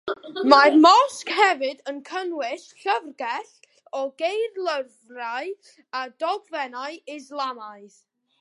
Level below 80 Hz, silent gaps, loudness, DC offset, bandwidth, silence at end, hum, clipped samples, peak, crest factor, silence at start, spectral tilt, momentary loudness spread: -76 dBFS; none; -22 LUFS; under 0.1%; 11.5 kHz; 0.55 s; none; under 0.1%; 0 dBFS; 22 dB; 0.05 s; -2 dB/octave; 20 LU